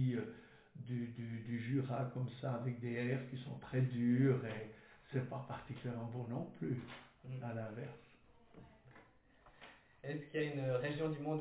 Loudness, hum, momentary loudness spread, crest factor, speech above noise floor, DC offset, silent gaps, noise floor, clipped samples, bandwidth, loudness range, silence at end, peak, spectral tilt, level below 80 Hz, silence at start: -41 LUFS; none; 23 LU; 18 dB; 27 dB; under 0.1%; none; -67 dBFS; under 0.1%; 4 kHz; 10 LU; 0 s; -22 dBFS; -7.5 dB/octave; -74 dBFS; 0 s